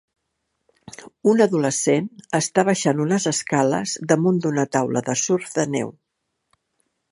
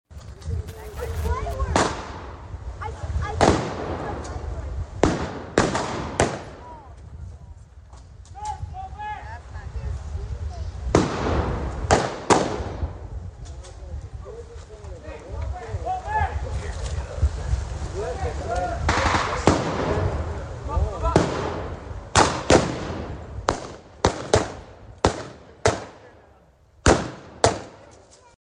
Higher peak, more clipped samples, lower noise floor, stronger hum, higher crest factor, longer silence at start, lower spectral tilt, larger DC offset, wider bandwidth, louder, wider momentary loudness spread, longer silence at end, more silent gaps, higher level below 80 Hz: about the same, -2 dBFS vs -2 dBFS; neither; first, -76 dBFS vs -54 dBFS; neither; about the same, 20 dB vs 24 dB; first, 1 s vs 0.1 s; about the same, -4.5 dB/octave vs -5 dB/octave; neither; about the same, 11.5 kHz vs 11 kHz; first, -21 LUFS vs -25 LUFS; second, 7 LU vs 19 LU; first, 1.2 s vs 0.45 s; neither; second, -66 dBFS vs -34 dBFS